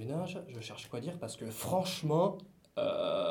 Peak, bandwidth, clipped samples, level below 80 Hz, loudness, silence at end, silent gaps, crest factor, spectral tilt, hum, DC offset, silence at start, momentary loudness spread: -18 dBFS; 19 kHz; under 0.1%; -72 dBFS; -36 LUFS; 0 s; none; 18 dB; -5.5 dB/octave; none; under 0.1%; 0 s; 13 LU